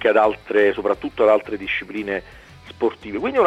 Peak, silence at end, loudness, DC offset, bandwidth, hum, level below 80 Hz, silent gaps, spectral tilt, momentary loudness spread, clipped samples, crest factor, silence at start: -4 dBFS; 0 s; -21 LUFS; under 0.1%; 9 kHz; none; -52 dBFS; none; -6 dB/octave; 9 LU; under 0.1%; 16 dB; 0 s